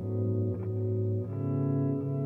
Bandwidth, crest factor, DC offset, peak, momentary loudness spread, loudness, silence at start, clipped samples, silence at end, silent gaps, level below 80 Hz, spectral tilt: 2.8 kHz; 12 dB; under 0.1%; -18 dBFS; 3 LU; -31 LUFS; 0 s; under 0.1%; 0 s; none; -64 dBFS; -13 dB/octave